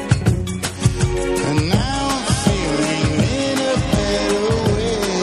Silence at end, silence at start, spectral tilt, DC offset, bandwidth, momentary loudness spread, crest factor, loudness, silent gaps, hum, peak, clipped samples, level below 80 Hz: 0 s; 0 s; -5 dB/octave; under 0.1%; 14.5 kHz; 2 LU; 16 dB; -19 LUFS; none; none; -2 dBFS; under 0.1%; -30 dBFS